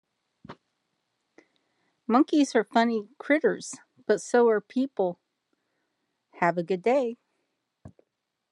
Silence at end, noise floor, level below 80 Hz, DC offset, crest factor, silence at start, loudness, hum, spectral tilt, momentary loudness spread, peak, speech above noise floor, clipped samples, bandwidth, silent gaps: 0.65 s; -80 dBFS; -78 dBFS; under 0.1%; 20 dB; 0.5 s; -25 LUFS; none; -5 dB/octave; 15 LU; -8 dBFS; 55 dB; under 0.1%; 11 kHz; none